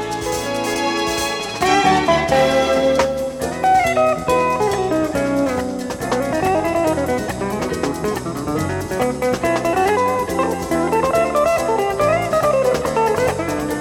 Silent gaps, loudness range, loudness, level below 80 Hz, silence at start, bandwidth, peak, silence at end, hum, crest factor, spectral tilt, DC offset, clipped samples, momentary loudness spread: none; 4 LU; -18 LUFS; -40 dBFS; 0 s; 19 kHz; -2 dBFS; 0 s; none; 16 dB; -4.5 dB/octave; under 0.1%; under 0.1%; 7 LU